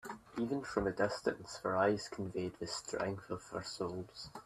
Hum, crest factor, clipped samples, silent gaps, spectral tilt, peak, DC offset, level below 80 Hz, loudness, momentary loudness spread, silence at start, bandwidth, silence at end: none; 20 dB; under 0.1%; none; -5 dB/octave; -18 dBFS; under 0.1%; -64 dBFS; -38 LUFS; 10 LU; 0.05 s; 14 kHz; 0 s